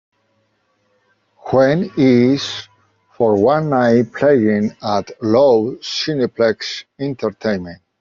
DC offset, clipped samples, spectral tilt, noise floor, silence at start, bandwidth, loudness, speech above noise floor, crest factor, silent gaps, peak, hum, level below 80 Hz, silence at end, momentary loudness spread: under 0.1%; under 0.1%; -6.5 dB/octave; -64 dBFS; 1.45 s; 7.4 kHz; -16 LUFS; 48 dB; 14 dB; none; -2 dBFS; none; -56 dBFS; 0.25 s; 12 LU